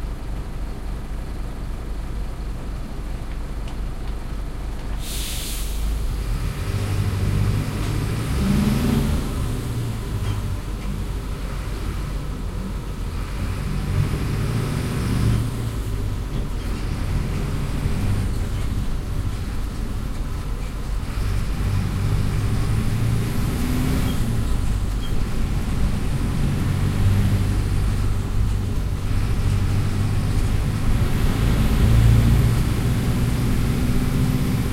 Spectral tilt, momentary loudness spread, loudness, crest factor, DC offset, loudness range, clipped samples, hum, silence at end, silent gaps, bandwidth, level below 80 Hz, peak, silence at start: -6.5 dB/octave; 11 LU; -24 LUFS; 18 dB; under 0.1%; 9 LU; under 0.1%; none; 0 s; none; 16 kHz; -24 dBFS; -4 dBFS; 0 s